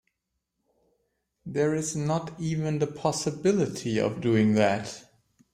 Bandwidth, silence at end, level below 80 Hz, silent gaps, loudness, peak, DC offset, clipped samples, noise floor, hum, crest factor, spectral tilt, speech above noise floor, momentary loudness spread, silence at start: 15 kHz; 0.5 s; -62 dBFS; none; -27 LUFS; -10 dBFS; under 0.1%; under 0.1%; -81 dBFS; none; 18 dB; -5.5 dB/octave; 55 dB; 10 LU; 1.45 s